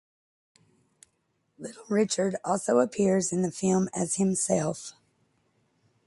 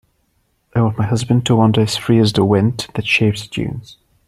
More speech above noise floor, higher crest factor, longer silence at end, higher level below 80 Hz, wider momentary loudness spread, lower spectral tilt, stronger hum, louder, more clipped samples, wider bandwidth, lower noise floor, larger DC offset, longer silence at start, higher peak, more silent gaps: about the same, 48 dB vs 48 dB; about the same, 18 dB vs 14 dB; first, 1.15 s vs 0.35 s; second, -66 dBFS vs -46 dBFS; first, 17 LU vs 10 LU; about the same, -5 dB/octave vs -6 dB/octave; neither; second, -26 LUFS vs -16 LUFS; neither; second, 11.5 kHz vs 13 kHz; first, -74 dBFS vs -63 dBFS; neither; first, 1.6 s vs 0.75 s; second, -10 dBFS vs -2 dBFS; neither